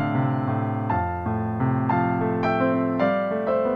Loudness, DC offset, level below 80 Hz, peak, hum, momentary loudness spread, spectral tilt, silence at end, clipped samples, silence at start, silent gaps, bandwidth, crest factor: -24 LUFS; under 0.1%; -48 dBFS; -10 dBFS; none; 3 LU; -10 dB/octave; 0 s; under 0.1%; 0 s; none; 5.2 kHz; 12 dB